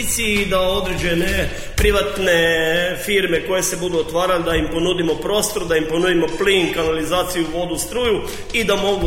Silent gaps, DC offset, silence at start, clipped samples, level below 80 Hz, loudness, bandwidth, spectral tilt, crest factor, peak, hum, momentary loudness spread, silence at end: none; under 0.1%; 0 s; under 0.1%; -32 dBFS; -18 LUFS; 16.5 kHz; -3.5 dB/octave; 14 dB; -4 dBFS; none; 5 LU; 0 s